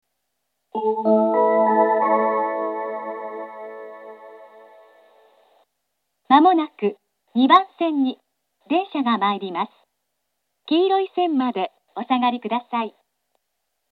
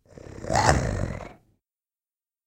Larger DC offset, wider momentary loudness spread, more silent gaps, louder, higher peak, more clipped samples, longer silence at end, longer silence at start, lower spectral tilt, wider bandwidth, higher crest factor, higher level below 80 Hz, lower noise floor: neither; second, 18 LU vs 22 LU; neither; first, -20 LUFS vs -25 LUFS; about the same, 0 dBFS vs -2 dBFS; neither; second, 1 s vs 1.15 s; first, 0.75 s vs 0.15 s; first, -7.5 dB/octave vs -4.5 dB/octave; second, 5.6 kHz vs 16 kHz; about the same, 22 dB vs 26 dB; second, -90 dBFS vs -38 dBFS; second, -77 dBFS vs under -90 dBFS